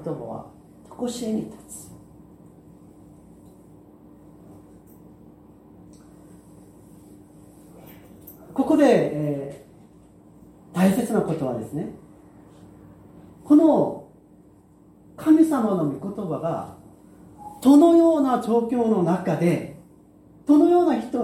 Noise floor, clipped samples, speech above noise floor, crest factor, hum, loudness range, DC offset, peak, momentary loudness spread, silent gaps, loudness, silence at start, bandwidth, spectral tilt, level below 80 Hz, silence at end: -52 dBFS; under 0.1%; 33 dB; 20 dB; none; 15 LU; under 0.1%; -4 dBFS; 21 LU; none; -21 LUFS; 0 s; 15 kHz; -7.5 dB/octave; -60 dBFS; 0 s